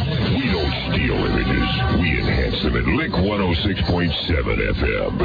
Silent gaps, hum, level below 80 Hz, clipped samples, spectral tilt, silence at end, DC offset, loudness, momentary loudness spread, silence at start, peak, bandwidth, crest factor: none; none; -26 dBFS; under 0.1%; -8 dB/octave; 0 s; under 0.1%; -20 LUFS; 2 LU; 0 s; -8 dBFS; 5 kHz; 12 dB